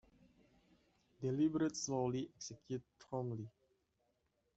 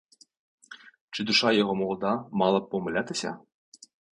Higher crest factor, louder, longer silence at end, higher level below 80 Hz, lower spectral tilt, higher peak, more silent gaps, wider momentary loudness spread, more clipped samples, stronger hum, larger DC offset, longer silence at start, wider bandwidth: about the same, 18 dB vs 20 dB; second, -41 LUFS vs -26 LUFS; first, 1.1 s vs 0.75 s; second, -76 dBFS vs -66 dBFS; about the same, -5.5 dB/octave vs -4.5 dB/octave; second, -26 dBFS vs -8 dBFS; second, none vs 1.01-1.08 s; second, 12 LU vs 23 LU; neither; neither; neither; first, 1.2 s vs 0.7 s; second, 8.2 kHz vs 11 kHz